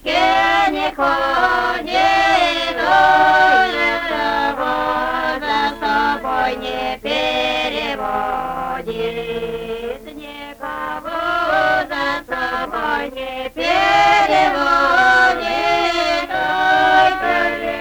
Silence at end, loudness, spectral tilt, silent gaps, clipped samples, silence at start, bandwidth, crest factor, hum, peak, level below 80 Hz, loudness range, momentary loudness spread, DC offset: 0 s; -16 LUFS; -3 dB/octave; none; under 0.1%; 0 s; over 20 kHz; 16 dB; none; -2 dBFS; -42 dBFS; 7 LU; 12 LU; under 0.1%